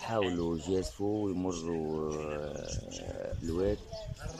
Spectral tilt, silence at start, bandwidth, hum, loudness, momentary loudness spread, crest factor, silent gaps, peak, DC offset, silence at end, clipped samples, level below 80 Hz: -6 dB/octave; 0 s; 15 kHz; none; -35 LUFS; 8 LU; 18 dB; none; -16 dBFS; under 0.1%; 0 s; under 0.1%; -48 dBFS